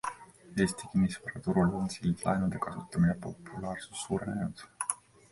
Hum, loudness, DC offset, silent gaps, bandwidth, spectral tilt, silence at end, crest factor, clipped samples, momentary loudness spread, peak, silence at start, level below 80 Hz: none; -33 LUFS; under 0.1%; none; 11.5 kHz; -6 dB/octave; 0.35 s; 22 dB; under 0.1%; 10 LU; -10 dBFS; 0.05 s; -54 dBFS